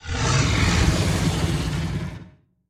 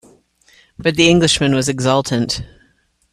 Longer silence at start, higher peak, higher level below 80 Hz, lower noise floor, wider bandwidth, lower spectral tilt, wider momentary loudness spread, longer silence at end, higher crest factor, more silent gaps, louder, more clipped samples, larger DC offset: second, 0.05 s vs 0.8 s; second, -6 dBFS vs 0 dBFS; first, -30 dBFS vs -44 dBFS; second, -47 dBFS vs -59 dBFS; about the same, 15 kHz vs 14.5 kHz; about the same, -4.5 dB/octave vs -4.5 dB/octave; about the same, 11 LU vs 10 LU; second, 0.4 s vs 0.7 s; about the same, 16 dB vs 16 dB; neither; second, -22 LUFS vs -15 LUFS; neither; neither